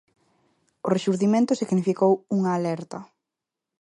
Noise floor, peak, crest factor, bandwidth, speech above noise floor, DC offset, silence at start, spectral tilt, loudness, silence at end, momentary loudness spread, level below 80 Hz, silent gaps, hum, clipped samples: -87 dBFS; -8 dBFS; 16 dB; 10.5 kHz; 64 dB; under 0.1%; 0.85 s; -7 dB/octave; -23 LUFS; 0.75 s; 12 LU; -72 dBFS; none; none; under 0.1%